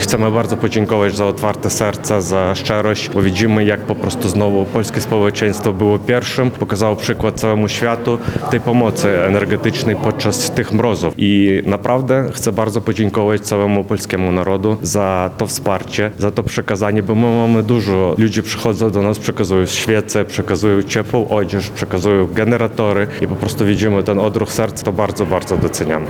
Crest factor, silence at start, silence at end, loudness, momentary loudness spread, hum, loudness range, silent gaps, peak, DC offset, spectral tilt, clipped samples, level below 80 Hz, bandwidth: 14 dB; 0 s; 0 s; -16 LUFS; 4 LU; none; 1 LU; none; -2 dBFS; under 0.1%; -5.5 dB/octave; under 0.1%; -42 dBFS; 18.5 kHz